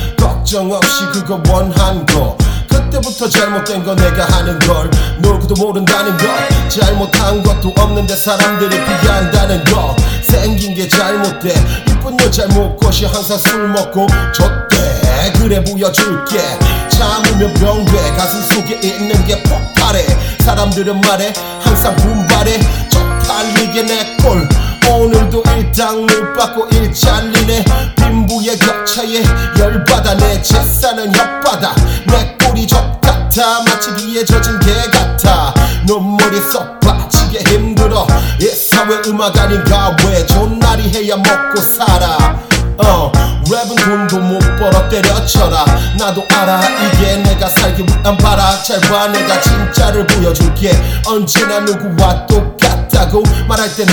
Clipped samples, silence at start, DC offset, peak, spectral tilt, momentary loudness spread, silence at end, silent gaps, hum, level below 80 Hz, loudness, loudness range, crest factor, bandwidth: 0.7%; 0 s; under 0.1%; 0 dBFS; -4.5 dB/octave; 4 LU; 0 s; none; none; -16 dBFS; -11 LUFS; 2 LU; 10 dB; over 20 kHz